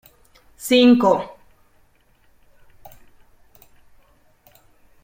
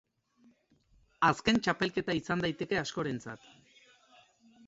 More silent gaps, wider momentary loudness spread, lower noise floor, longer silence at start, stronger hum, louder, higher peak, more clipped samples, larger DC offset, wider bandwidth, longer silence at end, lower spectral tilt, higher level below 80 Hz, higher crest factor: neither; first, 21 LU vs 12 LU; second, -57 dBFS vs -68 dBFS; second, 0.6 s vs 1.2 s; neither; first, -16 LUFS vs -31 LUFS; first, -2 dBFS vs -12 dBFS; neither; neither; first, 16.5 kHz vs 8 kHz; first, 3.75 s vs 1.3 s; about the same, -4.5 dB/octave vs -5 dB/octave; about the same, -58 dBFS vs -62 dBFS; about the same, 20 dB vs 22 dB